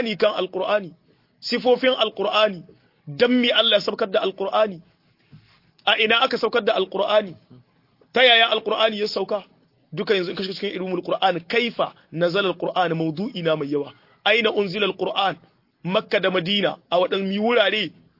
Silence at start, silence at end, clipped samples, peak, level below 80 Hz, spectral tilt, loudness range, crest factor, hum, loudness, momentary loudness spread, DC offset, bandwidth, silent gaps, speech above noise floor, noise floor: 0 s; 0.3 s; under 0.1%; -4 dBFS; -70 dBFS; -5.5 dB/octave; 4 LU; 18 dB; none; -21 LUFS; 11 LU; under 0.1%; 5.8 kHz; none; 39 dB; -60 dBFS